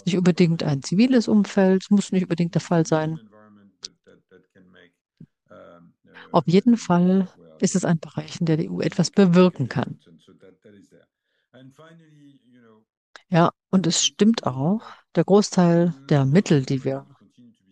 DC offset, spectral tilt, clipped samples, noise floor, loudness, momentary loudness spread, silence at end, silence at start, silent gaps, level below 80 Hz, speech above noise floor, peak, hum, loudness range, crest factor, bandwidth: under 0.1%; -6 dB/octave; under 0.1%; -72 dBFS; -21 LUFS; 10 LU; 0.7 s; 0.05 s; 5.01-5.05 s, 12.97-13.14 s; -66 dBFS; 52 dB; -2 dBFS; none; 9 LU; 20 dB; 9.8 kHz